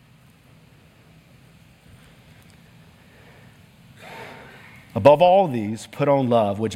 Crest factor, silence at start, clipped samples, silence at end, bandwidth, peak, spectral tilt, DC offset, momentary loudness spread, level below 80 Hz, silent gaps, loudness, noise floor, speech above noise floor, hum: 24 dB; 4 s; under 0.1%; 0 s; 14 kHz; 0 dBFS; -7 dB/octave; under 0.1%; 26 LU; -62 dBFS; none; -18 LUFS; -52 dBFS; 35 dB; none